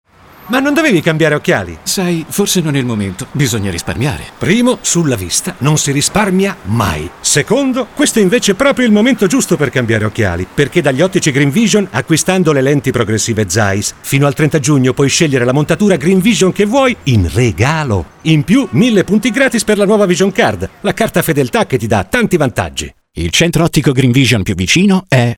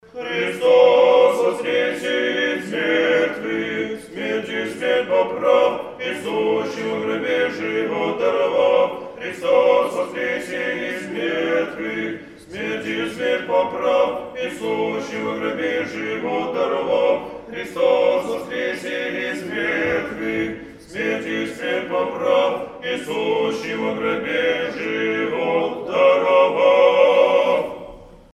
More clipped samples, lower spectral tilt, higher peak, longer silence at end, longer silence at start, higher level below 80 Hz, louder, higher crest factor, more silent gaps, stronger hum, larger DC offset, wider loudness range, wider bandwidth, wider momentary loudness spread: neither; about the same, -4.5 dB/octave vs -4.5 dB/octave; about the same, 0 dBFS vs -2 dBFS; second, 0 s vs 0.15 s; first, 0.45 s vs 0.15 s; first, -36 dBFS vs -58 dBFS; first, -12 LUFS vs -20 LUFS; second, 12 dB vs 18 dB; neither; neither; neither; second, 3 LU vs 6 LU; first, 18.5 kHz vs 12.5 kHz; second, 6 LU vs 11 LU